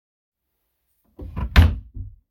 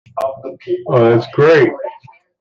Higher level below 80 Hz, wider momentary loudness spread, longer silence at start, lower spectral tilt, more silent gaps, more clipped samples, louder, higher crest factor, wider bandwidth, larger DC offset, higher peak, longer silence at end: first, -26 dBFS vs -58 dBFS; first, 22 LU vs 18 LU; first, 1.2 s vs 0.15 s; second, -6.5 dB/octave vs -8 dB/octave; neither; neither; second, -19 LUFS vs -13 LUFS; first, 22 dB vs 14 dB; first, 15 kHz vs 7.2 kHz; neither; about the same, -2 dBFS vs -2 dBFS; second, 0.2 s vs 0.5 s